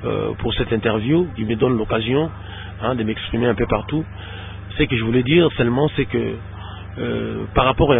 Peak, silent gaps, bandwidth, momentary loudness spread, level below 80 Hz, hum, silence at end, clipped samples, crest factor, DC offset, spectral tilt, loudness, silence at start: -2 dBFS; none; 3.9 kHz; 16 LU; -34 dBFS; none; 0 s; under 0.1%; 18 dB; under 0.1%; -11.5 dB/octave; -20 LUFS; 0 s